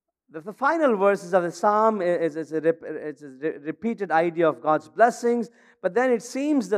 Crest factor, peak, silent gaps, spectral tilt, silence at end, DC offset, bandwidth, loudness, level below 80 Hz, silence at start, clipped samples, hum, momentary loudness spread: 20 dB; -4 dBFS; none; -6 dB/octave; 0 s; under 0.1%; 13 kHz; -23 LUFS; -80 dBFS; 0.35 s; under 0.1%; none; 13 LU